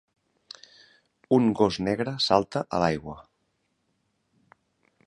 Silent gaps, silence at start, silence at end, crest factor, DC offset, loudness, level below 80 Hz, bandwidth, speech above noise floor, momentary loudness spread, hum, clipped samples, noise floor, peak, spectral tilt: none; 1.3 s; 1.85 s; 24 dB; under 0.1%; -25 LUFS; -56 dBFS; 11.5 kHz; 50 dB; 23 LU; none; under 0.1%; -74 dBFS; -4 dBFS; -6 dB/octave